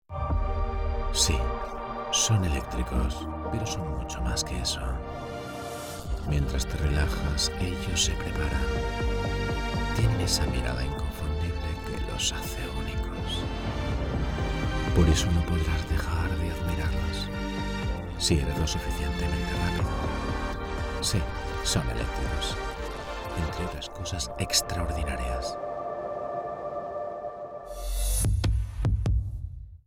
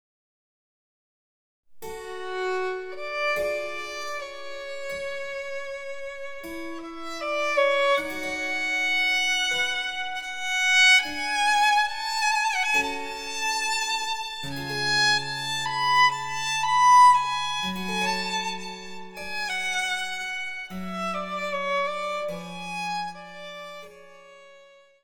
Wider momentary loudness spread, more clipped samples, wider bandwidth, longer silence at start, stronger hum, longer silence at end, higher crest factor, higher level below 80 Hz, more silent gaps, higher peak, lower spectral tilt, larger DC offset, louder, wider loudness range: second, 10 LU vs 16 LU; neither; second, 18 kHz vs 20 kHz; second, 0.1 s vs 1.7 s; neither; second, 0.1 s vs 0.45 s; about the same, 20 dB vs 18 dB; first, -32 dBFS vs -60 dBFS; neither; about the same, -8 dBFS vs -8 dBFS; first, -4 dB/octave vs -1.5 dB/octave; neither; second, -29 LUFS vs -24 LUFS; second, 4 LU vs 11 LU